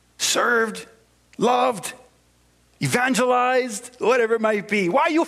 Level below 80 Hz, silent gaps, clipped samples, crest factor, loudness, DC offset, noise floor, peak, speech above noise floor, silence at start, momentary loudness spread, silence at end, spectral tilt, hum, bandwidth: -66 dBFS; none; under 0.1%; 18 dB; -21 LUFS; under 0.1%; -59 dBFS; -4 dBFS; 39 dB; 0.2 s; 10 LU; 0 s; -3.5 dB/octave; none; 15.5 kHz